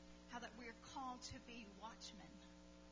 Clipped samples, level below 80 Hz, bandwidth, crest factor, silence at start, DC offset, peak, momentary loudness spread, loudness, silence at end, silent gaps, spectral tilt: under 0.1%; -70 dBFS; 8 kHz; 18 dB; 0 s; under 0.1%; -36 dBFS; 10 LU; -55 LUFS; 0 s; none; -3.5 dB/octave